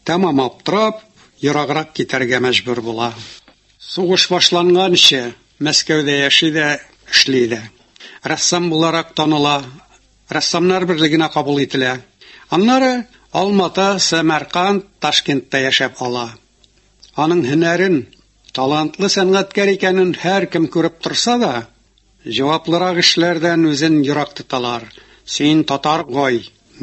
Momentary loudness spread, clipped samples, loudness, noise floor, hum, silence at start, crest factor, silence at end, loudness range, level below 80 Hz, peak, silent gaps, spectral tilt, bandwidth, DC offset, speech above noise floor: 11 LU; under 0.1%; -15 LUFS; -54 dBFS; none; 0.05 s; 16 dB; 0.35 s; 5 LU; -56 dBFS; 0 dBFS; none; -3.5 dB/octave; 11.5 kHz; under 0.1%; 38 dB